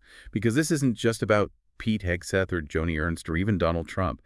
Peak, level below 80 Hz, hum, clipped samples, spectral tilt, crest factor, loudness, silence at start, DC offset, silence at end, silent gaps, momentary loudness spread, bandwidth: -8 dBFS; -46 dBFS; none; under 0.1%; -6 dB/octave; 18 dB; -27 LUFS; 0.15 s; under 0.1%; 0.1 s; none; 6 LU; 12 kHz